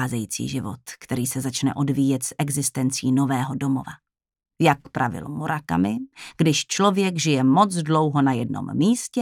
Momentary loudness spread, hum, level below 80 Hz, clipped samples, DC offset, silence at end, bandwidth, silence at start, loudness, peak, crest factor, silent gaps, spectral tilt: 9 LU; none; -60 dBFS; under 0.1%; under 0.1%; 0 s; 17 kHz; 0 s; -22 LUFS; -4 dBFS; 20 dB; none; -5 dB/octave